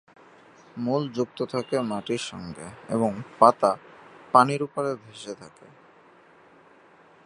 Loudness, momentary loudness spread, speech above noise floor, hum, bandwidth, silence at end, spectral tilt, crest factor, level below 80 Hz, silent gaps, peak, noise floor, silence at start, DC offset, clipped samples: -25 LUFS; 19 LU; 30 dB; none; 11.5 kHz; 1.8 s; -6 dB/octave; 26 dB; -66 dBFS; none; -2 dBFS; -55 dBFS; 0.75 s; under 0.1%; under 0.1%